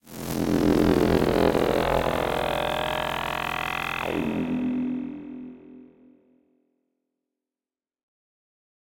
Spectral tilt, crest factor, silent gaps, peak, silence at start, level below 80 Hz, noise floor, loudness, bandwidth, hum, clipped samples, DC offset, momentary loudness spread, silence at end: -5.5 dB/octave; 20 dB; none; -8 dBFS; 0.05 s; -44 dBFS; under -90 dBFS; -25 LUFS; 17 kHz; none; under 0.1%; under 0.1%; 12 LU; 2.95 s